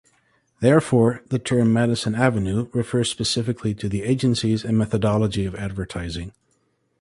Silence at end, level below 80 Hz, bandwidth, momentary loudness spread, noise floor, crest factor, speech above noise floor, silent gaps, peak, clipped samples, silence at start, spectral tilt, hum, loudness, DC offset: 0.7 s; -44 dBFS; 11.5 kHz; 11 LU; -68 dBFS; 18 dB; 47 dB; none; -4 dBFS; under 0.1%; 0.6 s; -6 dB/octave; none; -22 LUFS; under 0.1%